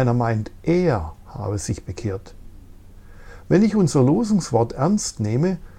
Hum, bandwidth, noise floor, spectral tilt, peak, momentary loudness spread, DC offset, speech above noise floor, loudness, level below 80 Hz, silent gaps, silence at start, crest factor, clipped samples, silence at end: none; 13 kHz; -42 dBFS; -6.5 dB/octave; -4 dBFS; 11 LU; under 0.1%; 22 dB; -21 LUFS; -42 dBFS; none; 0 s; 18 dB; under 0.1%; 0.05 s